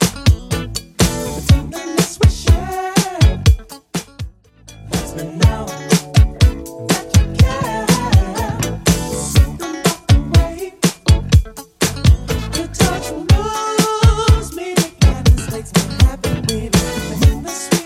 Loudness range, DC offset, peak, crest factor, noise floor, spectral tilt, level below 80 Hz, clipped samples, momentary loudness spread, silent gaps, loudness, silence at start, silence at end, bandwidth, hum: 3 LU; under 0.1%; 0 dBFS; 14 dB; -42 dBFS; -5 dB/octave; -20 dBFS; under 0.1%; 9 LU; none; -16 LUFS; 0 s; 0 s; 16 kHz; none